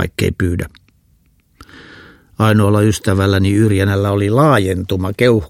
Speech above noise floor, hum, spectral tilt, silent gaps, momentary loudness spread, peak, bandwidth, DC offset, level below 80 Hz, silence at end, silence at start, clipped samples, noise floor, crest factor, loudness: 41 dB; none; -6.5 dB/octave; none; 7 LU; 0 dBFS; 15.5 kHz; under 0.1%; -38 dBFS; 0.05 s; 0 s; under 0.1%; -55 dBFS; 14 dB; -14 LUFS